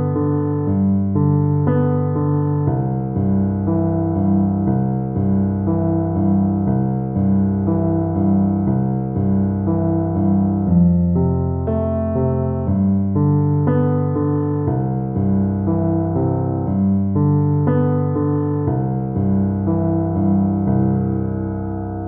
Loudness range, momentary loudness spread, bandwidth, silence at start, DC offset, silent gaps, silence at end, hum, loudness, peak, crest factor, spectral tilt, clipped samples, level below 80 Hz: 1 LU; 4 LU; 2.3 kHz; 0 s; under 0.1%; none; 0 s; none; -18 LUFS; -4 dBFS; 14 dB; -13 dB/octave; under 0.1%; -38 dBFS